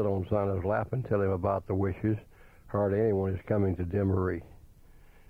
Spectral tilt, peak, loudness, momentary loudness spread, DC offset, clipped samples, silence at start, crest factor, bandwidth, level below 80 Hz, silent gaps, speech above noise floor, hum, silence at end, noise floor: -10.5 dB/octave; -14 dBFS; -30 LUFS; 5 LU; under 0.1%; under 0.1%; 0 s; 16 dB; 3.6 kHz; -52 dBFS; none; 25 dB; none; 0.2 s; -54 dBFS